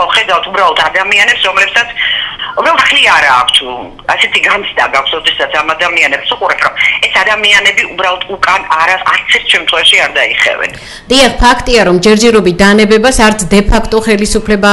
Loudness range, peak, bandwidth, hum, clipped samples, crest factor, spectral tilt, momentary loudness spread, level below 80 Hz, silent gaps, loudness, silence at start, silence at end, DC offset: 2 LU; 0 dBFS; 16 kHz; none; 0.8%; 8 dB; -3 dB/octave; 6 LU; -24 dBFS; none; -8 LUFS; 0 s; 0 s; under 0.1%